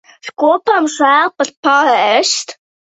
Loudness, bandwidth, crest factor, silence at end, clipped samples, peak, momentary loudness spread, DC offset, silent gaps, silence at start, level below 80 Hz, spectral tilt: -12 LUFS; 8.4 kHz; 14 dB; 0.45 s; under 0.1%; 0 dBFS; 7 LU; under 0.1%; 1.57-1.63 s; 0.25 s; -66 dBFS; -1 dB/octave